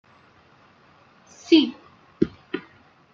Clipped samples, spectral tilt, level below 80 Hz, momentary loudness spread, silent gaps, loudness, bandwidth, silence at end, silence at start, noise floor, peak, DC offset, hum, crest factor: under 0.1%; -5.5 dB/octave; -60 dBFS; 17 LU; none; -23 LUFS; 7.4 kHz; 0.55 s; 1.5 s; -55 dBFS; -4 dBFS; under 0.1%; none; 24 dB